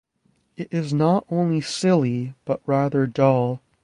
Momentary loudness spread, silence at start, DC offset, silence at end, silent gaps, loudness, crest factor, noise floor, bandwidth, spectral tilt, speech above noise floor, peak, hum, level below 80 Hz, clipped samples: 9 LU; 0.6 s; under 0.1%; 0.25 s; none; -22 LUFS; 18 dB; -66 dBFS; 11.5 kHz; -7 dB/octave; 45 dB; -4 dBFS; none; -60 dBFS; under 0.1%